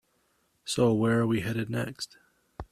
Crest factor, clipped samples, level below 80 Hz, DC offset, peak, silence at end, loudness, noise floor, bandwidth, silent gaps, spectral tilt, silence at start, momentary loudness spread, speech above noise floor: 18 dB; under 0.1%; -56 dBFS; under 0.1%; -12 dBFS; 0.1 s; -28 LUFS; -71 dBFS; 14 kHz; none; -6 dB/octave; 0.65 s; 16 LU; 44 dB